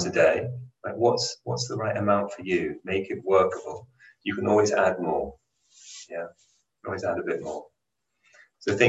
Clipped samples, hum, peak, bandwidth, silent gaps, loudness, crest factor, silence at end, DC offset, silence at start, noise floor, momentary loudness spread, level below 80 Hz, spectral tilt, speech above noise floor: under 0.1%; none; -6 dBFS; 8.6 kHz; none; -26 LUFS; 22 dB; 0 s; under 0.1%; 0 s; -81 dBFS; 16 LU; -58 dBFS; -5 dB/octave; 55 dB